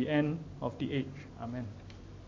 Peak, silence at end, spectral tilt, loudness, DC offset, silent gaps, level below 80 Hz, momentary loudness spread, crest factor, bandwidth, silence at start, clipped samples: -18 dBFS; 0 s; -8 dB/octave; -37 LUFS; under 0.1%; none; -56 dBFS; 15 LU; 18 dB; 7.4 kHz; 0 s; under 0.1%